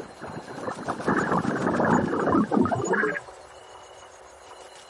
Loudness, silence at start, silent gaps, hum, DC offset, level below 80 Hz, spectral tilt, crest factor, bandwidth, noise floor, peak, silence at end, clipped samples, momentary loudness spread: -25 LUFS; 0 s; none; none; under 0.1%; -58 dBFS; -6 dB/octave; 18 dB; 11.5 kHz; -47 dBFS; -10 dBFS; 0 s; under 0.1%; 23 LU